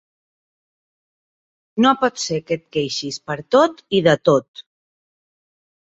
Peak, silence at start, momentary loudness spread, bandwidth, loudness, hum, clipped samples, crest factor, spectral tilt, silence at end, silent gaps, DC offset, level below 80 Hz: -2 dBFS; 1.75 s; 10 LU; 8 kHz; -19 LUFS; none; under 0.1%; 20 dB; -4.5 dB/octave; 1.35 s; 4.48-4.54 s; under 0.1%; -60 dBFS